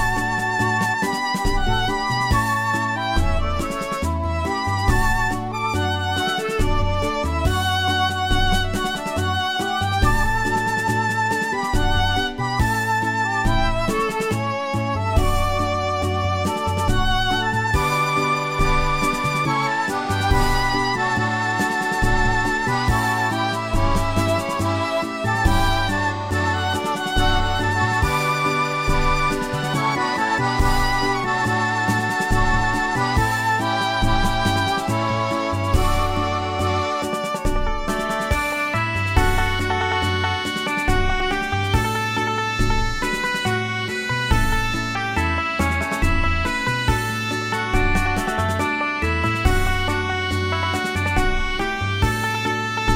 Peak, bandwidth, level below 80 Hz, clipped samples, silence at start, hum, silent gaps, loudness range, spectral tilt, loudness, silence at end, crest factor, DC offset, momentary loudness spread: -2 dBFS; 16.5 kHz; -26 dBFS; under 0.1%; 0 s; none; none; 2 LU; -4.5 dB/octave; -21 LUFS; 0 s; 18 dB; under 0.1%; 3 LU